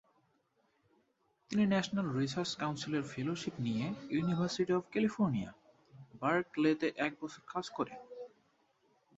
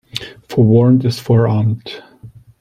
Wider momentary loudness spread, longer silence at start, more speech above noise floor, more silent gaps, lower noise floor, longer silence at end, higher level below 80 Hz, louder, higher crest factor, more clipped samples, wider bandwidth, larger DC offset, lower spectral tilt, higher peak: second, 10 LU vs 17 LU; first, 1.5 s vs 0.15 s; first, 42 dB vs 28 dB; neither; first, -76 dBFS vs -40 dBFS; first, 0.9 s vs 0.3 s; second, -70 dBFS vs -50 dBFS; second, -35 LUFS vs -14 LUFS; first, 20 dB vs 14 dB; neither; second, 8 kHz vs 14 kHz; neither; second, -6 dB/octave vs -8 dB/octave; second, -16 dBFS vs -2 dBFS